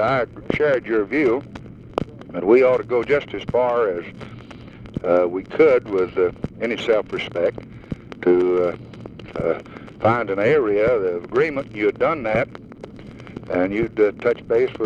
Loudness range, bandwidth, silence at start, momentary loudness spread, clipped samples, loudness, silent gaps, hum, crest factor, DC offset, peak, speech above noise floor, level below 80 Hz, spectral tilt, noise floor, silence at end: 2 LU; 7.6 kHz; 0 s; 20 LU; under 0.1%; -20 LUFS; none; none; 18 dB; under 0.1%; -4 dBFS; 19 dB; -48 dBFS; -7.5 dB/octave; -39 dBFS; 0 s